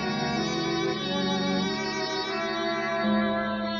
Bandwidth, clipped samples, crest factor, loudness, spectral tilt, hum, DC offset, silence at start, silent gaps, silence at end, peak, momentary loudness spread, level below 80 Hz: 7.2 kHz; under 0.1%; 14 dB; -27 LUFS; -4.5 dB/octave; none; under 0.1%; 0 s; none; 0 s; -14 dBFS; 3 LU; -56 dBFS